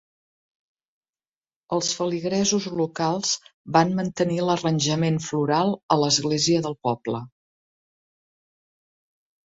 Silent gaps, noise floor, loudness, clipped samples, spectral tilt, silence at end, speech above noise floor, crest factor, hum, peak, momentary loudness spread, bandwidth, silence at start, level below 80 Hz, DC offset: 3.54-3.65 s, 5.83-5.89 s; under -90 dBFS; -23 LUFS; under 0.1%; -4.5 dB/octave; 2.15 s; over 67 dB; 22 dB; none; -4 dBFS; 7 LU; 8 kHz; 1.7 s; -62 dBFS; under 0.1%